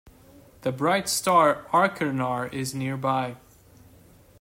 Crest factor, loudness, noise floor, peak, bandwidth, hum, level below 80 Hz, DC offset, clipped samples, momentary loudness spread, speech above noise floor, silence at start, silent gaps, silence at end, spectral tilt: 20 dB; -24 LUFS; -53 dBFS; -6 dBFS; 16 kHz; none; -62 dBFS; under 0.1%; under 0.1%; 11 LU; 29 dB; 0.65 s; none; 1.05 s; -4.5 dB/octave